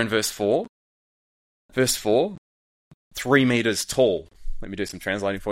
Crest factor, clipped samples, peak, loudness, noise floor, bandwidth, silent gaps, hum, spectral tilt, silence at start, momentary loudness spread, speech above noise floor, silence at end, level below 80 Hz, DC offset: 20 dB; under 0.1%; -4 dBFS; -23 LUFS; under -90 dBFS; 16.5 kHz; 0.69-1.69 s, 2.38-3.11 s; none; -4 dB/octave; 0 s; 17 LU; over 67 dB; 0 s; -42 dBFS; under 0.1%